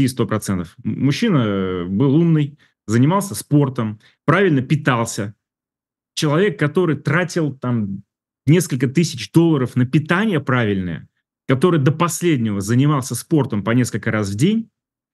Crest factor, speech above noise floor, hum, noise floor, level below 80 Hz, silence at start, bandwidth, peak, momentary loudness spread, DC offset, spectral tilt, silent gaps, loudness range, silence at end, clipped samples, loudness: 18 dB; 72 dB; none; -89 dBFS; -58 dBFS; 0 s; 12.5 kHz; 0 dBFS; 10 LU; under 0.1%; -6 dB/octave; none; 2 LU; 0.5 s; under 0.1%; -18 LUFS